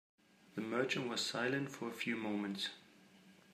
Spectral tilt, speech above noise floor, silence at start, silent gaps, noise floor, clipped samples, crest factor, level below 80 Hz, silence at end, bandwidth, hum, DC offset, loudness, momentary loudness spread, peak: -4 dB/octave; 24 dB; 0.55 s; none; -64 dBFS; under 0.1%; 20 dB; -88 dBFS; 0.2 s; 15.5 kHz; none; under 0.1%; -39 LUFS; 8 LU; -22 dBFS